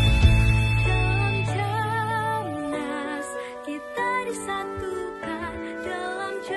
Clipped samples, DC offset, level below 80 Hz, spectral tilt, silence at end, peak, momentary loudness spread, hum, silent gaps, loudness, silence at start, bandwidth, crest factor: under 0.1%; under 0.1%; -30 dBFS; -6 dB/octave; 0 s; -4 dBFS; 12 LU; none; none; -26 LUFS; 0 s; 12 kHz; 20 dB